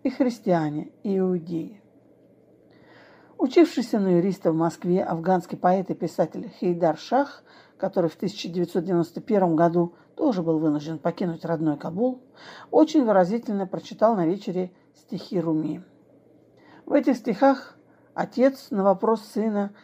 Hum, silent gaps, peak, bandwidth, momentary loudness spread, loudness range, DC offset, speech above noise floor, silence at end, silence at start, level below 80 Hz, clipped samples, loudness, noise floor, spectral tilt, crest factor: none; none; -6 dBFS; 15.5 kHz; 11 LU; 4 LU; under 0.1%; 33 dB; 0.1 s; 0.05 s; -74 dBFS; under 0.1%; -24 LUFS; -56 dBFS; -7.5 dB/octave; 18 dB